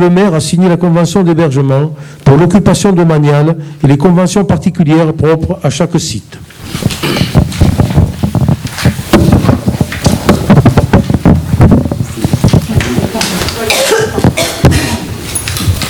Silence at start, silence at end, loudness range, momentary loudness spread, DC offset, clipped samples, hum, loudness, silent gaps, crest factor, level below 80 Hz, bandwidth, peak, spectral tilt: 0 s; 0 s; 3 LU; 7 LU; under 0.1%; 1%; none; -10 LUFS; none; 8 dB; -24 dBFS; over 20 kHz; 0 dBFS; -6 dB/octave